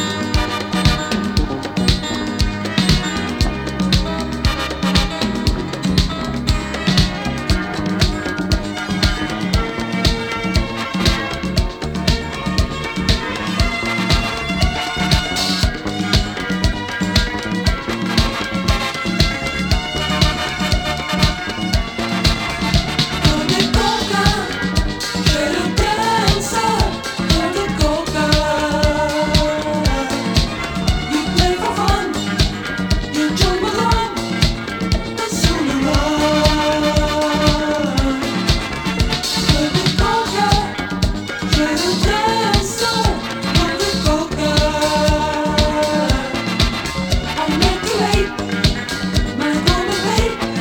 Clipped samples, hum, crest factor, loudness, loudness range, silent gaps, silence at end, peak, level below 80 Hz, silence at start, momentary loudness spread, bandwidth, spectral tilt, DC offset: under 0.1%; none; 18 dB; -18 LUFS; 2 LU; none; 0 s; 0 dBFS; -24 dBFS; 0 s; 5 LU; 19 kHz; -4.5 dB/octave; under 0.1%